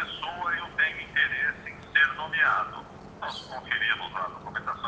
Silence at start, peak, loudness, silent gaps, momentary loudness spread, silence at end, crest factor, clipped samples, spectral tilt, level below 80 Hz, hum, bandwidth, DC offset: 0 s; -10 dBFS; -27 LUFS; none; 14 LU; 0 s; 20 dB; under 0.1%; -3.5 dB/octave; -60 dBFS; none; 8.8 kHz; under 0.1%